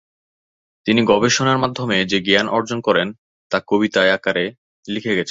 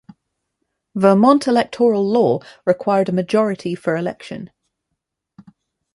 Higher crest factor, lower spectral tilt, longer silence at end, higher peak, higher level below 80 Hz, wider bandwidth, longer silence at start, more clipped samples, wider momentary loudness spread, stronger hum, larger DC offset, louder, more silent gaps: about the same, 18 dB vs 18 dB; second, -4 dB/octave vs -7 dB/octave; second, 0 s vs 1.5 s; about the same, 0 dBFS vs -2 dBFS; first, -56 dBFS vs -64 dBFS; second, 7.8 kHz vs 11.5 kHz; about the same, 0.85 s vs 0.95 s; neither; second, 11 LU vs 15 LU; neither; neither; about the same, -18 LUFS vs -17 LUFS; first, 3.18-3.50 s, 4.58-4.83 s vs none